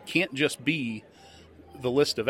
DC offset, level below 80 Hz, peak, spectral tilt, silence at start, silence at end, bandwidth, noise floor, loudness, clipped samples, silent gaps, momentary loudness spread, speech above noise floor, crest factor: under 0.1%; -66 dBFS; -8 dBFS; -4.5 dB/octave; 0 s; 0 s; 16 kHz; -50 dBFS; -27 LUFS; under 0.1%; none; 10 LU; 22 dB; 20 dB